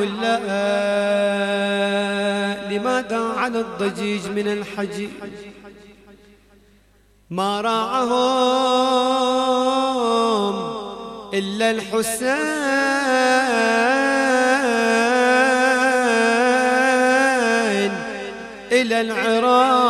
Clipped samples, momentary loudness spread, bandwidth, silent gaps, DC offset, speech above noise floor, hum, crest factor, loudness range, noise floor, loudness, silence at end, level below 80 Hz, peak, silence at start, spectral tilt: under 0.1%; 11 LU; 14.5 kHz; none; under 0.1%; 36 dB; none; 16 dB; 10 LU; -55 dBFS; -19 LUFS; 0 s; -58 dBFS; -4 dBFS; 0 s; -3.5 dB/octave